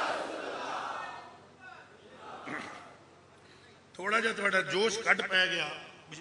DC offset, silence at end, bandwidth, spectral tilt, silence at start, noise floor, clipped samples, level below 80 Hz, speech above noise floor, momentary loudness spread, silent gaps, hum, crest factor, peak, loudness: under 0.1%; 0 s; 11 kHz; -2.5 dB/octave; 0 s; -57 dBFS; under 0.1%; -78 dBFS; 28 dB; 24 LU; none; none; 24 dB; -10 dBFS; -31 LUFS